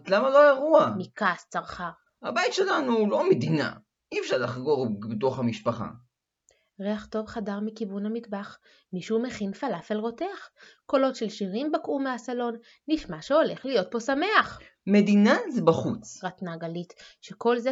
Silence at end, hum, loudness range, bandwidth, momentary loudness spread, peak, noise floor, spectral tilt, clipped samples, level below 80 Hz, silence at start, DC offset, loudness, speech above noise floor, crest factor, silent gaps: 0 s; none; 9 LU; 7.8 kHz; 16 LU; -6 dBFS; -68 dBFS; -6 dB/octave; under 0.1%; -64 dBFS; 0.05 s; under 0.1%; -26 LUFS; 42 dB; 20 dB; none